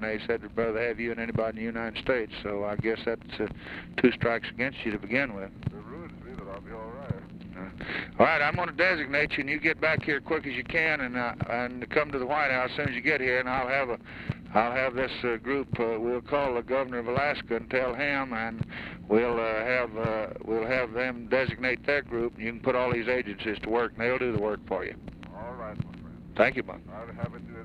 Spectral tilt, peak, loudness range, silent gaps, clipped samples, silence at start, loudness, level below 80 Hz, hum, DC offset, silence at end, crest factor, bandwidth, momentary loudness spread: -7.5 dB/octave; -6 dBFS; 5 LU; none; under 0.1%; 0 s; -29 LUFS; -52 dBFS; none; under 0.1%; 0 s; 22 dB; 9.8 kHz; 14 LU